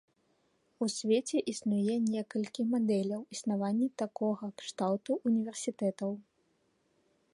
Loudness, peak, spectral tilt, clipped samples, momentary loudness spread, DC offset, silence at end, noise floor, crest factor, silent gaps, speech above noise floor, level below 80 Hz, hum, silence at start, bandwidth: -33 LUFS; -18 dBFS; -5.5 dB/octave; under 0.1%; 7 LU; under 0.1%; 1.1 s; -74 dBFS; 16 dB; none; 42 dB; -80 dBFS; none; 0.8 s; 11.5 kHz